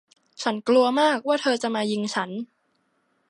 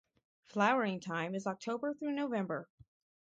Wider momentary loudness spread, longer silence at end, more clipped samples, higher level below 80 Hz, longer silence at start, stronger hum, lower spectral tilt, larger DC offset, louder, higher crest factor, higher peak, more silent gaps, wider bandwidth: first, 12 LU vs 9 LU; first, 0.85 s vs 0.6 s; neither; about the same, -78 dBFS vs -78 dBFS; about the same, 0.4 s vs 0.5 s; neither; second, -4 dB/octave vs -6 dB/octave; neither; first, -23 LUFS vs -36 LUFS; about the same, 18 dB vs 22 dB; first, -8 dBFS vs -16 dBFS; neither; first, 11.5 kHz vs 8.8 kHz